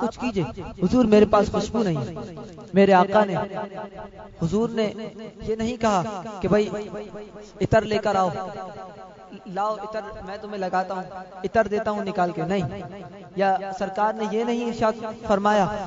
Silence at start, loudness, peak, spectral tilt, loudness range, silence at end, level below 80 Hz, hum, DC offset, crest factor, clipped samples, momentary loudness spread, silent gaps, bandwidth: 0 s; -23 LUFS; -4 dBFS; -6.5 dB/octave; 7 LU; 0 s; -48 dBFS; none; under 0.1%; 20 dB; under 0.1%; 19 LU; none; 7.8 kHz